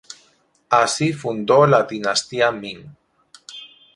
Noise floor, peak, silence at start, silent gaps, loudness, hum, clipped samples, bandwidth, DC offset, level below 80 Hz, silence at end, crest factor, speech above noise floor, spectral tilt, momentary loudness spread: -59 dBFS; 0 dBFS; 0.1 s; none; -18 LUFS; none; under 0.1%; 11.5 kHz; under 0.1%; -62 dBFS; 0.3 s; 20 dB; 41 dB; -4 dB/octave; 23 LU